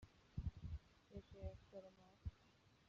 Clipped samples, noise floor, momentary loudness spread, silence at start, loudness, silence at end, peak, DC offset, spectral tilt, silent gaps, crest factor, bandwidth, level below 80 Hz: under 0.1%; -73 dBFS; 9 LU; 0 s; -56 LUFS; 0 s; -36 dBFS; under 0.1%; -8 dB/octave; none; 18 dB; 7.4 kHz; -60 dBFS